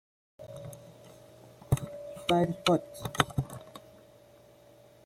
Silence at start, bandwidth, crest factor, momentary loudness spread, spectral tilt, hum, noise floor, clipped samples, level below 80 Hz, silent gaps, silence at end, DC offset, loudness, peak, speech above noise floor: 0.4 s; 16 kHz; 28 dB; 25 LU; -5.5 dB/octave; none; -57 dBFS; under 0.1%; -56 dBFS; none; 1.25 s; under 0.1%; -31 LUFS; -6 dBFS; 29 dB